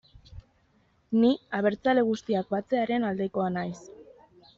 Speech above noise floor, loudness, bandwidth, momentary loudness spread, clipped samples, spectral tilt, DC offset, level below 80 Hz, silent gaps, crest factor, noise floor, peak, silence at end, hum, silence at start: 40 dB; -27 LUFS; 7.4 kHz; 7 LU; under 0.1%; -5 dB/octave; under 0.1%; -60 dBFS; none; 16 dB; -66 dBFS; -12 dBFS; 0.55 s; none; 0.3 s